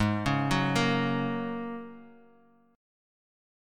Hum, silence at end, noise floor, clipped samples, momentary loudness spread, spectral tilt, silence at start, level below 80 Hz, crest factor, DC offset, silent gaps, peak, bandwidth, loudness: none; 1.6 s; -61 dBFS; under 0.1%; 14 LU; -6 dB/octave; 0 s; -52 dBFS; 18 dB; under 0.1%; none; -12 dBFS; 16 kHz; -29 LUFS